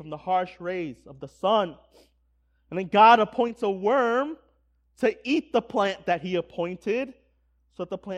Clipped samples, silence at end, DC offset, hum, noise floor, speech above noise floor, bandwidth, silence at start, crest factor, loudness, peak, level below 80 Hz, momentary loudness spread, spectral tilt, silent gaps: under 0.1%; 0 s; under 0.1%; none; -67 dBFS; 43 dB; 10.5 kHz; 0 s; 22 dB; -25 LUFS; -4 dBFS; -64 dBFS; 17 LU; -6 dB/octave; none